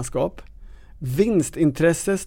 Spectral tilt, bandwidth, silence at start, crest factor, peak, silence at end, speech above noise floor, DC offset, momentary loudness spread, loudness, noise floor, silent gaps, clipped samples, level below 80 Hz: -6 dB/octave; 17 kHz; 0 s; 16 dB; -6 dBFS; 0 s; 21 dB; under 0.1%; 9 LU; -21 LUFS; -42 dBFS; none; under 0.1%; -42 dBFS